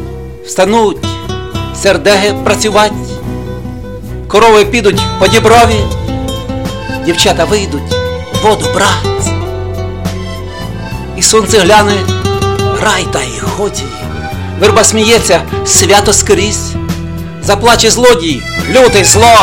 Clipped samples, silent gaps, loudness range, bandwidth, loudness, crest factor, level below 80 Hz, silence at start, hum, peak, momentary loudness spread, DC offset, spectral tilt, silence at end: 0.6%; none; 4 LU; over 20 kHz; -9 LUFS; 10 dB; -26 dBFS; 0 s; none; 0 dBFS; 15 LU; 2%; -3.5 dB/octave; 0 s